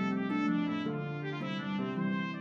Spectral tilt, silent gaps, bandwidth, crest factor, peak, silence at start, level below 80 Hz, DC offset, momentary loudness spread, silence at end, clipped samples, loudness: -7.5 dB/octave; none; 7 kHz; 12 dB; -20 dBFS; 0 s; -76 dBFS; under 0.1%; 6 LU; 0 s; under 0.1%; -34 LUFS